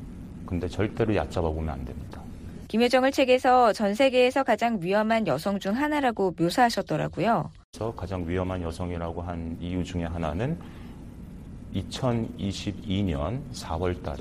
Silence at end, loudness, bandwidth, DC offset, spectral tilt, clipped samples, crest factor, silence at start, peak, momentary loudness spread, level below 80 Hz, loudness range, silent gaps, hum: 0 s; -26 LUFS; 15 kHz; under 0.1%; -6 dB/octave; under 0.1%; 18 dB; 0 s; -8 dBFS; 18 LU; -44 dBFS; 9 LU; 7.64-7.73 s; none